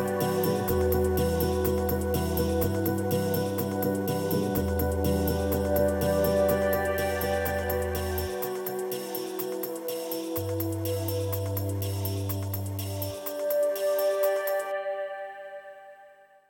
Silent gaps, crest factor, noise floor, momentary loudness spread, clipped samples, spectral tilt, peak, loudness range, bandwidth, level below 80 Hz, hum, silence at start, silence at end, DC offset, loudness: none; 14 dB; -54 dBFS; 7 LU; under 0.1%; -6 dB/octave; -14 dBFS; 5 LU; 17.5 kHz; -42 dBFS; none; 0 s; 0.35 s; under 0.1%; -28 LUFS